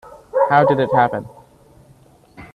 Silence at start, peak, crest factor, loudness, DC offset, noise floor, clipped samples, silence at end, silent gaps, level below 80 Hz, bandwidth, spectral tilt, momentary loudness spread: 0.1 s; 0 dBFS; 20 dB; -17 LUFS; under 0.1%; -50 dBFS; under 0.1%; 0.1 s; none; -54 dBFS; 11 kHz; -8 dB/octave; 10 LU